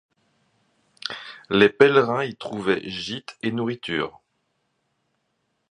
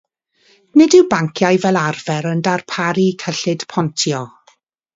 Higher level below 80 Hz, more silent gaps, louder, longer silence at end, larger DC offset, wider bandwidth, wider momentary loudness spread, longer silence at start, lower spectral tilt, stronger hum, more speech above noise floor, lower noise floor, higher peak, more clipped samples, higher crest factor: about the same, -62 dBFS vs -60 dBFS; neither; second, -23 LUFS vs -16 LUFS; first, 1.6 s vs 0.65 s; neither; first, 10 kHz vs 7.8 kHz; first, 16 LU vs 10 LU; first, 1.05 s vs 0.75 s; about the same, -5.5 dB/octave vs -5 dB/octave; neither; first, 52 dB vs 41 dB; first, -73 dBFS vs -56 dBFS; about the same, 0 dBFS vs 0 dBFS; neither; first, 24 dB vs 16 dB